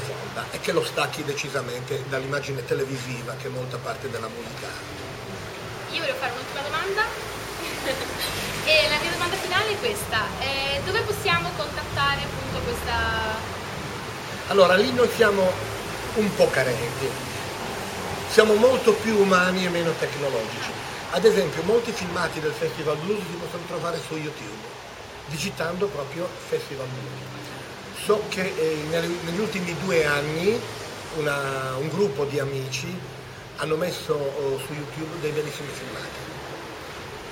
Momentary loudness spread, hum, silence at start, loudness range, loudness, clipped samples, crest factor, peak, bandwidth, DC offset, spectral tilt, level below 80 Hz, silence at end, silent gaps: 15 LU; none; 0 s; 9 LU; -25 LUFS; under 0.1%; 26 dB; 0 dBFS; 16.5 kHz; under 0.1%; -4 dB/octave; -48 dBFS; 0 s; none